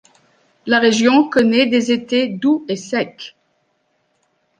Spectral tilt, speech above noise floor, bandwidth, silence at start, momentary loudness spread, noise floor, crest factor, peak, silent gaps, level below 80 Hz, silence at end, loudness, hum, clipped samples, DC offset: -4 dB/octave; 50 dB; 9.6 kHz; 0.65 s; 15 LU; -65 dBFS; 16 dB; -2 dBFS; none; -62 dBFS; 1.3 s; -16 LUFS; none; under 0.1%; under 0.1%